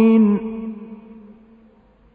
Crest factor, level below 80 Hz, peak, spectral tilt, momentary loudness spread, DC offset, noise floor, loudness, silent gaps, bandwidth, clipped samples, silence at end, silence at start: 14 dB; -56 dBFS; -6 dBFS; -11 dB/octave; 24 LU; under 0.1%; -52 dBFS; -19 LUFS; none; 3.6 kHz; under 0.1%; 0.95 s; 0 s